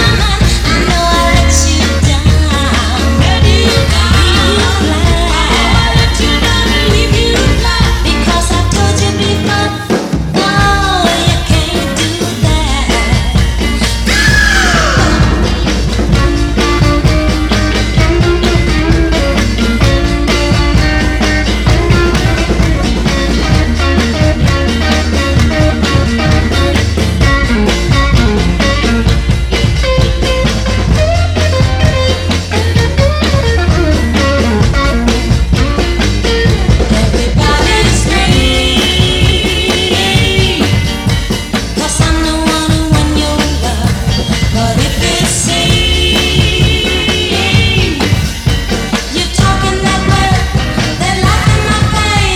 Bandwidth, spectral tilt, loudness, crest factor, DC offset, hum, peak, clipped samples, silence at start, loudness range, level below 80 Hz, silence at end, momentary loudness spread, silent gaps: 15.5 kHz; -4.5 dB/octave; -10 LUFS; 10 dB; under 0.1%; none; 0 dBFS; 0.2%; 0 s; 2 LU; -14 dBFS; 0 s; 4 LU; none